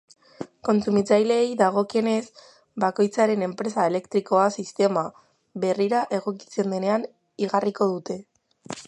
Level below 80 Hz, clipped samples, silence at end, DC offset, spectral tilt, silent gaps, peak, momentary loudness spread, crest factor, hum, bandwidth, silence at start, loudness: -70 dBFS; under 0.1%; 0 s; under 0.1%; -6 dB/octave; none; -4 dBFS; 15 LU; 20 dB; none; 11 kHz; 0.4 s; -24 LUFS